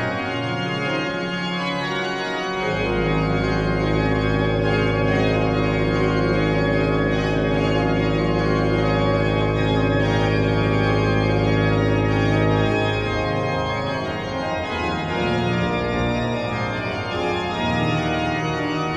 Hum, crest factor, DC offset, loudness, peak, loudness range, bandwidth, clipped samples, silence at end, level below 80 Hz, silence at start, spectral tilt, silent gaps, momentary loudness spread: none; 14 dB; under 0.1%; -21 LUFS; -6 dBFS; 3 LU; 9 kHz; under 0.1%; 0 s; -34 dBFS; 0 s; -7 dB/octave; none; 5 LU